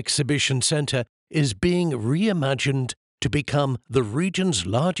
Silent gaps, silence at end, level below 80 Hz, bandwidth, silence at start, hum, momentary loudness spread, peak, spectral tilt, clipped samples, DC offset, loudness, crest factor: 1.09-1.27 s, 2.97-3.18 s; 0 s; -48 dBFS; 11.5 kHz; 0 s; none; 6 LU; -6 dBFS; -4.5 dB/octave; under 0.1%; under 0.1%; -23 LUFS; 16 dB